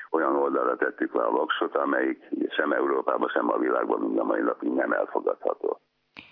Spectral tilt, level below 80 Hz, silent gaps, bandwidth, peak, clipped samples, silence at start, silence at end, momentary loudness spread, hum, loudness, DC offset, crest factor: -8 dB/octave; -88 dBFS; none; 5 kHz; -8 dBFS; under 0.1%; 0 s; 0.1 s; 4 LU; none; -26 LUFS; under 0.1%; 18 dB